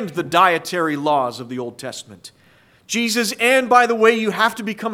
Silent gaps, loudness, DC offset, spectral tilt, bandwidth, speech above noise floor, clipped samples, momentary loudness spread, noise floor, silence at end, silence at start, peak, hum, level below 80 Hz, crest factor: none; -17 LUFS; under 0.1%; -3.5 dB/octave; 16.5 kHz; 35 dB; under 0.1%; 15 LU; -53 dBFS; 0 s; 0 s; 0 dBFS; none; -66 dBFS; 18 dB